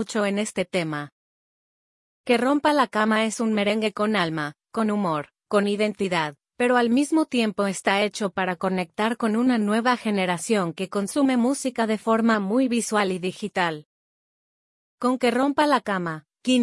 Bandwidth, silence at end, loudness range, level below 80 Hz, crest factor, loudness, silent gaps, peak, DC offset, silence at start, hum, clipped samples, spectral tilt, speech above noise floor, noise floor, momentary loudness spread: 12 kHz; 0 s; 2 LU; -70 dBFS; 18 dB; -23 LUFS; 1.12-2.24 s, 13.85-14.98 s; -6 dBFS; under 0.1%; 0 s; none; under 0.1%; -4.5 dB/octave; over 67 dB; under -90 dBFS; 7 LU